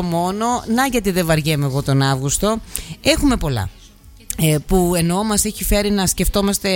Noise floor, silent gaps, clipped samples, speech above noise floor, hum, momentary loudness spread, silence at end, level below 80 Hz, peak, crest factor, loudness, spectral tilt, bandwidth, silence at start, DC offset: -43 dBFS; none; under 0.1%; 26 dB; none; 4 LU; 0 s; -30 dBFS; -2 dBFS; 16 dB; -18 LUFS; -4.5 dB/octave; 17 kHz; 0 s; under 0.1%